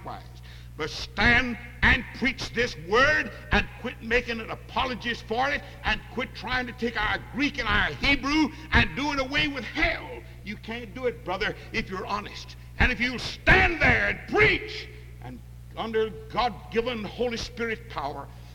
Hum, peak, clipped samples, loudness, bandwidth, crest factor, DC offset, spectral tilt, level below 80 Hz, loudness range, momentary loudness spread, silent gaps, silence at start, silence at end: 60 Hz at -45 dBFS; -6 dBFS; under 0.1%; -25 LUFS; 18 kHz; 22 dB; under 0.1%; -5 dB/octave; -38 dBFS; 7 LU; 18 LU; none; 0 s; 0 s